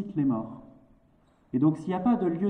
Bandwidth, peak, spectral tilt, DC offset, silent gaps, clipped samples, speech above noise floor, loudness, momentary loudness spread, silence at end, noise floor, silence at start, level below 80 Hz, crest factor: 8.8 kHz; -12 dBFS; -10 dB/octave; under 0.1%; none; under 0.1%; 37 dB; -27 LUFS; 13 LU; 0 s; -63 dBFS; 0 s; -62 dBFS; 16 dB